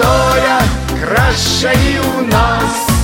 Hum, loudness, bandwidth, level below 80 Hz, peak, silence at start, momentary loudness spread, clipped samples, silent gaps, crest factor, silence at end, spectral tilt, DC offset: none; -12 LUFS; 17 kHz; -22 dBFS; 0 dBFS; 0 s; 4 LU; under 0.1%; none; 12 dB; 0 s; -4.5 dB/octave; under 0.1%